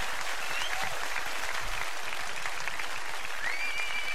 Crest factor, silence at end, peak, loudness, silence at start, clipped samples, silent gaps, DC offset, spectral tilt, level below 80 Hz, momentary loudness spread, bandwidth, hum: 20 dB; 0 s; -14 dBFS; -33 LUFS; 0 s; under 0.1%; none; 3%; -0.5 dB/octave; -52 dBFS; 4 LU; 16 kHz; none